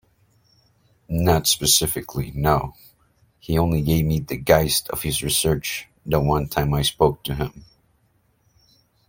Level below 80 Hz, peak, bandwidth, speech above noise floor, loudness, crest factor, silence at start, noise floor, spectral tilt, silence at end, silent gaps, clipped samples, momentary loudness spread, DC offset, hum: -38 dBFS; 0 dBFS; 17 kHz; 43 dB; -21 LUFS; 22 dB; 1.1 s; -64 dBFS; -4 dB/octave; 1.45 s; none; under 0.1%; 11 LU; under 0.1%; none